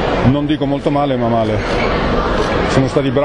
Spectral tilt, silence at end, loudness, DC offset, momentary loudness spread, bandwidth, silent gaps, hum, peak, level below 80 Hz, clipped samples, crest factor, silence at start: -7 dB/octave; 0 s; -15 LUFS; under 0.1%; 2 LU; 10.5 kHz; none; none; 0 dBFS; -26 dBFS; under 0.1%; 14 dB; 0 s